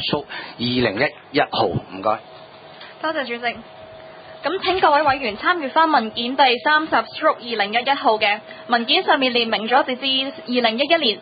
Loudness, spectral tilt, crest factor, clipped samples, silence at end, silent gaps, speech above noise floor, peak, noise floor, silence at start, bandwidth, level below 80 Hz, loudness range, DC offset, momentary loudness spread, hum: -19 LUFS; -9 dB/octave; 18 dB; under 0.1%; 0 s; none; 22 dB; -2 dBFS; -41 dBFS; 0 s; 5 kHz; -54 dBFS; 6 LU; under 0.1%; 10 LU; none